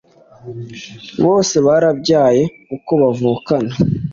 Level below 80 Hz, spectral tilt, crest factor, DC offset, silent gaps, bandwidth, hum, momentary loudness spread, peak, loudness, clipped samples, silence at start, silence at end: -48 dBFS; -6 dB/octave; 14 dB; under 0.1%; none; 7.6 kHz; none; 18 LU; -2 dBFS; -15 LUFS; under 0.1%; 0.45 s; 0 s